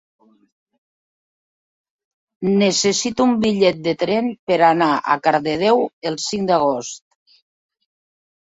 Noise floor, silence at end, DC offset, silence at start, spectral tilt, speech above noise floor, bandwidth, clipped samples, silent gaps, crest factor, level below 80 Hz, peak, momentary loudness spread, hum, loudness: under -90 dBFS; 1.5 s; under 0.1%; 2.4 s; -4 dB/octave; over 73 dB; 8 kHz; under 0.1%; 4.39-4.47 s, 5.93-6.02 s; 18 dB; -60 dBFS; -2 dBFS; 9 LU; none; -18 LUFS